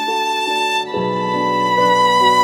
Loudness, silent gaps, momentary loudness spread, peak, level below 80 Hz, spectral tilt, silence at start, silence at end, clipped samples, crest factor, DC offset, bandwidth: -16 LUFS; none; 7 LU; -2 dBFS; -62 dBFS; -3.5 dB/octave; 0 s; 0 s; under 0.1%; 14 dB; under 0.1%; 16.5 kHz